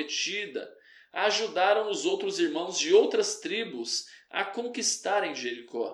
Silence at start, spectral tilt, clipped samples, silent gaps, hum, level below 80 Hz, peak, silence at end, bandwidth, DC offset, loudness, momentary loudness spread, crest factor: 0 s; -1.5 dB/octave; under 0.1%; none; none; -90 dBFS; -10 dBFS; 0 s; 12.5 kHz; under 0.1%; -28 LUFS; 12 LU; 20 dB